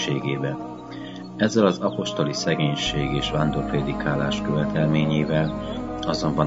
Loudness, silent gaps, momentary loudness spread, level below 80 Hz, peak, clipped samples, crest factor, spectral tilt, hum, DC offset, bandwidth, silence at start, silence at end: -23 LUFS; none; 10 LU; -42 dBFS; -4 dBFS; under 0.1%; 20 dB; -6 dB/octave; none; 0.1%; 7.8 kHz; 0 s; 0 s